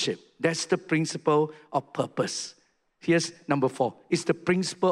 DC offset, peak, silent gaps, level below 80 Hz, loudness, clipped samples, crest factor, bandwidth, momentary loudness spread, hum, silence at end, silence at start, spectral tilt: under 0.1%; -10 dBFS; none; -70 dBFS; -27 LUFS; under 0.1%; 18 dB; 12 kHz; 7 LU; none; 0 s; 0 s; -4.5 dB/octave